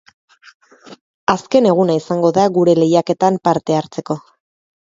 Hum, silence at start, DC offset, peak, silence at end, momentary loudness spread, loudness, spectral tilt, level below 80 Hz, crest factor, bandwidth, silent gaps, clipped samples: none; 0.9 s; under 0.1%; 0 dBFS; 0.7 s; 11 LU; -15 LUFS; -6.5 dB/octave; -60 dBFS; 16 dB; 7.8 kHz; 1.01-1.27 s; under 0.1%